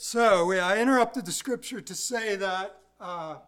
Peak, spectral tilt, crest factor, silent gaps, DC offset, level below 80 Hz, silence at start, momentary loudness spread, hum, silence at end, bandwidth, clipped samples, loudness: -10 dBFS; -3 dB/octave; 18 dB; none; under 0.1%; -68 dBFS; 0 s; 15 LU; none; 0.1 s; 17.5 kHz; under 0.1%; -26 LUFS